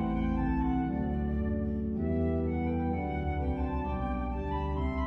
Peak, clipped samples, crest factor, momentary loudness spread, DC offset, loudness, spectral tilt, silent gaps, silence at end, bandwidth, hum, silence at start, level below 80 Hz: -20 dBFS; under 0.1%; 12 dB; 3 LU; under 0.1%; -32 LUFS; -10.5 dB/octave; none; 0 s; 4.2 kHz; none; 0 s; -36 dBFS